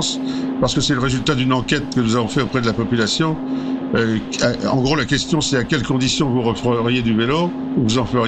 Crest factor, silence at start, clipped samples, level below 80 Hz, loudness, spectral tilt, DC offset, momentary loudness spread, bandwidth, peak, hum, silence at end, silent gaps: 14 dB; 0 s; under 0.1%; -40 dBFS; -18 LUFS; -5 dB/octave; 0.2%; 3 LU; 9.2 kHz; -4 dBFS; none; 0 s; none